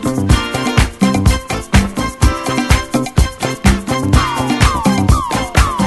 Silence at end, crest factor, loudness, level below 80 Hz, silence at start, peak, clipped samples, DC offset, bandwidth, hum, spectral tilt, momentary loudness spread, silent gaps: 0 s; 14 dB; -14 LUFS; -18 dBFS; 0 s; 0 dBFS; 0.2%; under 0.1%; 12.5 kHz; none; -5 dB/octave; 4 LU; none